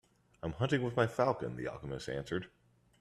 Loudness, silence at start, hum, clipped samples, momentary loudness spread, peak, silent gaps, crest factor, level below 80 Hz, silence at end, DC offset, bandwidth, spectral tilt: -36 LUFS; 0.45 s; none; under 0.1%; 12 LU; -16 dBFS; none; 20 dB; -62 dBFS; 0.55 s; under 0.1%; 13 kHz; -6.5 dB/octave